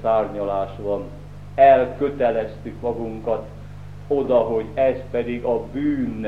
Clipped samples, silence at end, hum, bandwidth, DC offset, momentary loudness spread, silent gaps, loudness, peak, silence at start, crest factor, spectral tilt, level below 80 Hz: under 0.1%; 0 s; 50 Hz at -40 dBFS; 6.2 kHz; 0.7%; 17 LU; none; -21 LUFS; -2 dBFS; 0 s; 18 dB; -8.5 dB/octave; -44 dBFS